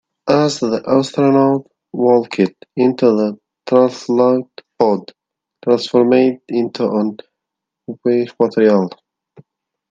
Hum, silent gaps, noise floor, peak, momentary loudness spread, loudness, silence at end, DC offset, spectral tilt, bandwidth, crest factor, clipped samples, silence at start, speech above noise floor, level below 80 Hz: none; none; -81 dBFS; 0 dBFS; 9 LU; -16 LUFS; 1 s; under 0.1%; -6.5 dB/octave; 9 kHz; 16 dB; under 0.1%; 0.25 s; 66 dB; -64 dBFS